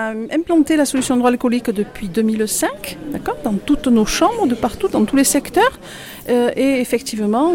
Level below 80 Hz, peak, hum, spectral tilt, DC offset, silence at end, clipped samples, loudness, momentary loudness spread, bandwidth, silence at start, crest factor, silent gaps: -40 dBFS; -4 dBFS; none; -4 dB/octave; under 0.1%; 0 s; under 0.1%; -17 LUFS; 9 LU; 17 kHz; 0 s; 14 dB; none